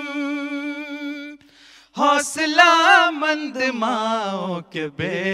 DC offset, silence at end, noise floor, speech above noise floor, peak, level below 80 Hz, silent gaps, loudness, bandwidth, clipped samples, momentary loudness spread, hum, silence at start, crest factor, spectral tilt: under 0.1%; 0 s; -50 dBFS; 31 dB; 0 dBFS; -68 dBFS; none; -19 LUFS; 15 kHz; under 0.1%; 17 LU; none; 0 s; 20 dB; -3 dB/octave